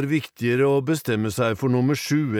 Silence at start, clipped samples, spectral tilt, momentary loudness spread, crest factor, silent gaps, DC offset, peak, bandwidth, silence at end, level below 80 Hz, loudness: 0 s; under 0.1%; -6 dB/octave; 4 LU; 12 dB; none; under 0.1%; -10 dBFS; 18.5 kHz; 0 s; -60 dBFS; -22 LUFS